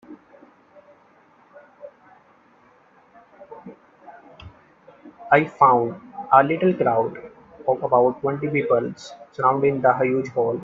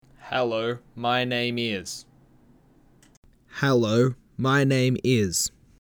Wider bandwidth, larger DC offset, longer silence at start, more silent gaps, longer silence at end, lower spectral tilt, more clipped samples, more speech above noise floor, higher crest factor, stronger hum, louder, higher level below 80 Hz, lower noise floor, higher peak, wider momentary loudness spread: second, 7.6 kHz vs 19.5 kHz; neither; about the same, 0.1 s vs 0.2 s; second, none vs 3.17-3.22 s; second, 0 s vs 0.35 s; first, -7.5 dB/octave vs -5 dB/octave; neither; about the same, 36 dB vs 34 dB; first, 22 dB vs 16 dB; neither; first, -20 LUFS vs -24 LUFS; second, -64 dBFS vs -58 dBFS; about the same, -55 dBFS vs -57 dBFS; first, 0 dBFS vs -10 dBFS; first, 22 LU vs 10 LU